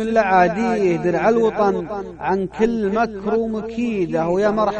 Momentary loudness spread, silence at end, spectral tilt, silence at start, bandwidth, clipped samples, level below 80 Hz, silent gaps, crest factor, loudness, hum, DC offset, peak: 8 LU; 0 s; -7 dB/octave; 0 s; 8.8 kHz; under 0.1%; -46 dBFS; none; 14 dB; -19 LUFS; none; under 0.1%; -4 dBFS